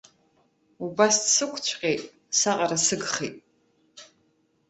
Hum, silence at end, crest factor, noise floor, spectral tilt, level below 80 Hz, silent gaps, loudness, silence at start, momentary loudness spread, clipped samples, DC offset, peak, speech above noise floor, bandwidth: none; 0.65 s; 22 dB; -68 dBFS; -1.5 dB/octave; -70 dBFS; none; -23 LUFS; 0.8 s; 12 LU; under 0.1%; under 0.1%; -6 dBFS; 43 dB; 8.8 kHz